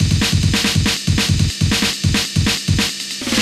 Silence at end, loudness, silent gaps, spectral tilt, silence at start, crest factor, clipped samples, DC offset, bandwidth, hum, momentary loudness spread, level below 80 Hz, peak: 0 s; -16 LUFS; none; -3.5 dB/octave; 0 s; 14 dB; under 0.1%; under 0.1%; 15 kHz; none; 3 LU; -28 dBFS; -4 dBFS